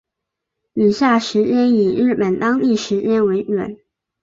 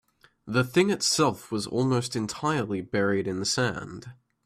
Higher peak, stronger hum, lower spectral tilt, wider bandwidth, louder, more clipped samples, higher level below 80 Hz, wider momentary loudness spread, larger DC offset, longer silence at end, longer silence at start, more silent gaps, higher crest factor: first, -4 dBFS vs -10 dBFS; neither; first, -6 dB/octave vs -4.5 dB/octave; second, 7.6 kHz vs 15.5 kHz; first, -17 LUFS vs -26 LUFS; neither; about the same, -58 dBFS vs -62 dBFS; about the same, 7 LU vs 8 LU; neither; first, 0.5 s vs 0.3 s; first, 0.75 s vs 0.45 s; neither; about the same, 14 dB vs 18 dB